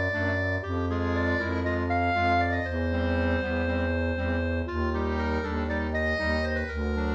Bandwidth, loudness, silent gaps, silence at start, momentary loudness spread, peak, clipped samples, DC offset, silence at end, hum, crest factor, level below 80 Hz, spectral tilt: 7.4 kHz; -27 LUFS; none; 0 s; 4 LU; -14 dBFS; under 0.1%; under 0.1%; 0 s; none; 12 dB; -36 dBFS; -7.5 dB/octave